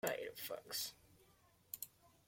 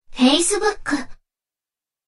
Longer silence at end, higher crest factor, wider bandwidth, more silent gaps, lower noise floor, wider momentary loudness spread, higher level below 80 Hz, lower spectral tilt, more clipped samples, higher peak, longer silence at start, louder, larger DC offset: second, 0.2 s vs 1 s; about the same, 22 dB vs 20 dB; first, 17 kHz vs 12 kHz; neither; second, -72 dBFS vs under -90 dBFS; about the same, 10 LU vs 10 LU; second, -80 dBFS vs -44 dBFS; about the same, -1.5 dB/octave vs -1.5 dB/octave; neither; second, -26 dBFS vs -2 dBFS; about the same, 0.05 s vs 0.1 s; second, -46 LUFS vs -19 LUFS; neither